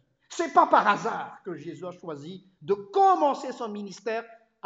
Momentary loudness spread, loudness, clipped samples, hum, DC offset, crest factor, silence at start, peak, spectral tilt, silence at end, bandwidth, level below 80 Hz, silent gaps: 18 LU; -25 LUFS; under 0.1%; none; under 0.1%; 20 dB; 0.3 s; -6 dBFS; -4.5 dB/octave; 0.3 s; 8 kHz; -78 dBFS; none